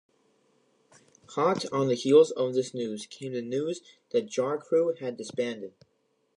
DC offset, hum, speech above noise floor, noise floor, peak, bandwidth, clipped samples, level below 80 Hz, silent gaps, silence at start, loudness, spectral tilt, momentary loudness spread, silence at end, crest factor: under 0.1%; none; 45 dB; -73 dBFS; -8 dBFS; 11 kHz; under 0.1%; -80 dBFS; none; 1.3 s; -28 LUFS; -5.5 dB/octave; 15 LU; 0.7 s; 20 dB